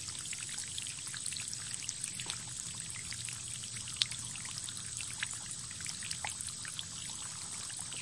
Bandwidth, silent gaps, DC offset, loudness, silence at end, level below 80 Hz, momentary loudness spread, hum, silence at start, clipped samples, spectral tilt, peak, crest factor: 12 kHz; none; under 0.1%; -38 LUFS; 0 s; -68 dBFS; 3 LU; none; 0 s; under 0.1%; 0 dB/octave; -6 dBFS; 34 dB